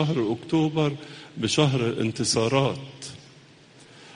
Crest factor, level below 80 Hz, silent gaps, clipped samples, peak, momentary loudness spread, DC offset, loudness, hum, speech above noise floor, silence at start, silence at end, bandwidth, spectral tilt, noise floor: 20 dB; -58 dBFS; none; under 0.1%; -6 dBFS; 17 LU; under 0.1%; -24 LUFS; none; 27 dB; 0 s; 0.05 s; 10.5 kHz; -5 dB/octave; -51 dBFS